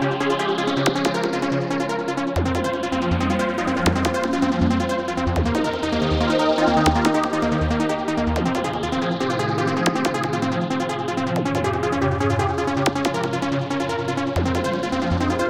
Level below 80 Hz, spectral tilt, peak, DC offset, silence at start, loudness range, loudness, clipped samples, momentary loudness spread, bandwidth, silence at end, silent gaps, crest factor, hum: -36 dBFS; -5.5 dB/octave; -6 dBFS; 0.2%; 0 s; 2 LU; -22 LUFS; under 0.1%; 4 LU; 17 kHz; 0 s; none; 16 dB; none